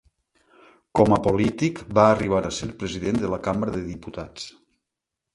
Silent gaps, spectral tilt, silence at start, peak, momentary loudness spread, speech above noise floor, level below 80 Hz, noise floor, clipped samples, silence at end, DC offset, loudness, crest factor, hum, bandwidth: none; -6.5 dB/octave; 0.95 s; -2 dBFS; 17 LU; 62 dB; -46 dBFS; -85 dBFS; under 0.1%; 0.85 s; under 0.1%; -23 LUFS; 22 dB; none; 11.5 kHz